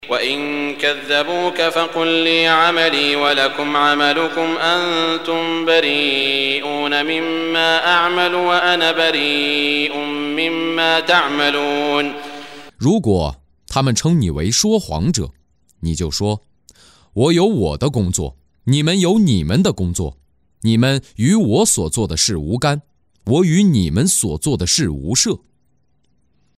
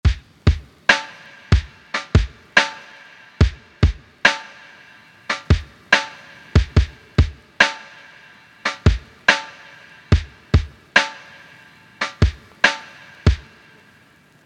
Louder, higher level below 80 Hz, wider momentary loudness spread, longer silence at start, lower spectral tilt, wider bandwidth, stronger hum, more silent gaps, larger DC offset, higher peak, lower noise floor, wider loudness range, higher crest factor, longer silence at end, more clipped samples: first, -16 LUFS vs -20 LUFS; second, -38 dBFS vs -28 dBFS; second, 8 LU vs 19 LU; about the same, 0 s vs 0.05 s; about the same, -4 dB/octave vs -5 dB/octave; first, 16 kHz vs 9.8 kHz; neither; neither; neither; about the same, -2 dBFS vs 0 dBFS; first, -64 dBFS vs -52 dBFS; about the same, 4 LU vs 2 LU; about the same, 16 dB vs 20 dB; first, 1.2 s vs 1.05 s; neither